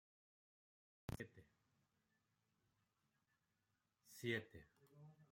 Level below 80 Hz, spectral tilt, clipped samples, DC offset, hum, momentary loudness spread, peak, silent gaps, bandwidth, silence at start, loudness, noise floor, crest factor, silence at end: -76 dBFS; -5 dB/octave; under 0.1%; under 0.1%; none; 21 LU; -30 dBFS; none; 16.5 kHz; 1.1 s; -50 LUFS; -88 dBFS; 26 dB; 0.05 s